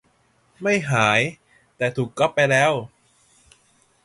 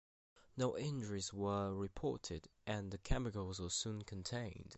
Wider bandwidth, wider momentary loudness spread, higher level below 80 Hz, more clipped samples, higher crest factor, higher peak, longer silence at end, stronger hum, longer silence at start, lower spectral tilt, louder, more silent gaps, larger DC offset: first, 11.5 kHz vs 8.2 kHz; first, 10 LU vs 6 LU; second, -60 dBFS vs -54 dBFS; neither; about the same, 22 dB vs 22 dB; first, -2 dBFS vs -22 dBFS; first, 1.15 s vs 0 s; neither; about the same, 0.6 s vs 0.55 s; about the same, -4.5 dB/octave vs -5 dB/octave; first, -20 LUFS vs -43 LUFS; neither; neither